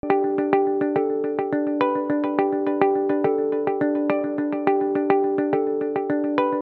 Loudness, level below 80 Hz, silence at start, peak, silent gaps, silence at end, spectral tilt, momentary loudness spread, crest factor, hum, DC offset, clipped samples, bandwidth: -22 LUFS; -64 dBFS; 0.05 s; -4 dBFS; none; 0 s; -9.5 dB/octave; 3 LU; 18 dB; none; under 0.1%; under 0.1%; 4.5 kHz